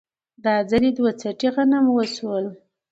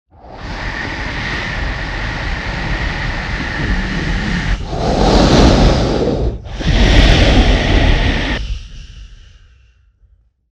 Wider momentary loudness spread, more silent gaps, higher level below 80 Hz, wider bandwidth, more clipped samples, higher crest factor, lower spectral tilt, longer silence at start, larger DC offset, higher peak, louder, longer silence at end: second, 9 LU vs 12 LU; neither; second, -56 dBFS vs -18 dBFS; about the same, 8 kHz vs 8.8 kHz; neither; about the same, 16 dB vs 14 dB; about the same, -5.5 dB/octave vs -5.5 dB/octave; first, 0.45 s vs 0.25 s; neither; second, -6 dBFS vs 0 dBFS; second, -21 LUFS vs -15 LUFS; second, 0.35 s vs 1.4 s